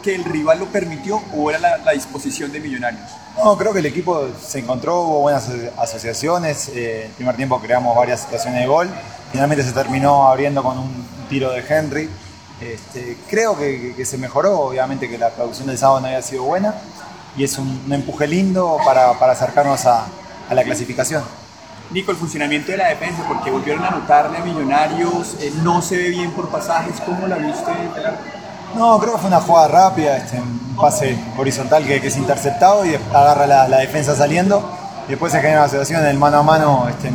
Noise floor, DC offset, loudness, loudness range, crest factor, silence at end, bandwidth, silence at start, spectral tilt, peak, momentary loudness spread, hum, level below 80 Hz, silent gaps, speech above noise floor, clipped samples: -38 dBFS; 0.1%; -17 LUFS; 6 LU; 16 dB; 0 s; over 20 kHz; 0 s; -5 dB/octave; 0 dBFS; 13 LU; none; -50 dBFS; none; 21 dB; under 0.1%